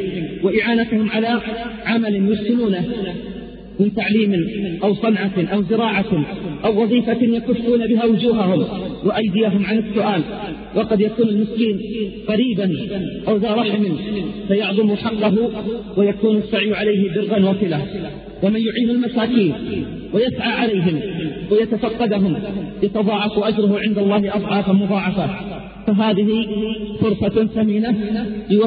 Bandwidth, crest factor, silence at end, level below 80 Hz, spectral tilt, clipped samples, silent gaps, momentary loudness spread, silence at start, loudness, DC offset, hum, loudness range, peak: 4.9 kHz; 14 dB; 0 s; -46 dBFS; -5.5 dB/octave; under 0.1%; none; 8 LU; 0 s; -19 LUFS; under 0.1%; none; 2 LU; -4 dBFS